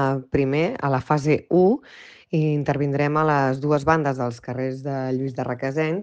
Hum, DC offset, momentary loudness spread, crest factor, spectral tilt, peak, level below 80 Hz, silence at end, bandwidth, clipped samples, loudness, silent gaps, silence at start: none; under 0.1%; 8 LU; 18 dB; -8 dB/octave; -4 dBFS; -52 dBFS; 0 s; 8.4 kHz; under 0.1%; -22 LUFS; none; 0 s